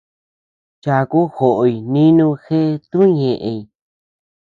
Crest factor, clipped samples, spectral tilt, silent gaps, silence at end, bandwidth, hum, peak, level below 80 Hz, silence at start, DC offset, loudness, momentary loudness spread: 16 dB; under 0.1%; -10 dB/octave; none; 0.8 s; 4.9 kHz; none; 0 dBFS; -58 dBFS; 0.85 s; under 0.1%; -15 LUFS; 10 LU